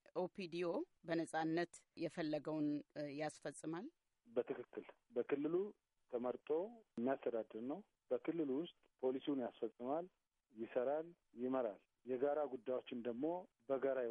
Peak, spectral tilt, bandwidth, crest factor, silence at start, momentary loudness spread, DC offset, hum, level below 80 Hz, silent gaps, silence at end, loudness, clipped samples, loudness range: -26 dBFS; -6.5 dB/octave; 11 kHz; 18 dB; 0.15 s; 9 LU; under 0.1%; none; -90 dBFS; none; 0 s; -44 LUFS; under 0.1%; 2 LU